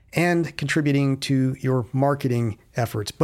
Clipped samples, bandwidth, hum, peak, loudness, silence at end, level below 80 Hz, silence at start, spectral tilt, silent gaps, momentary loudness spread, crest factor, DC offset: under 0.1%; 15 kHz; none; -6 dBFS; -23 LUFS; 0 s; -56 dBFS; 0.15 s; -6.5 dB/octave; none; 6 LU; 18 dB; under 0.1%